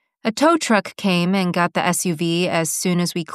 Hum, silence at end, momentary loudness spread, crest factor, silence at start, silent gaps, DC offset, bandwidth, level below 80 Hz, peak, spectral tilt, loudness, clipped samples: none; 0 s; 3 LU; 18 dB; 0.25 s; none; under 0.1%; 14.5 kHz; -68 dBFS; -2 dBFS; -4.5 dB/octave; -19 LUFS; under 0.1%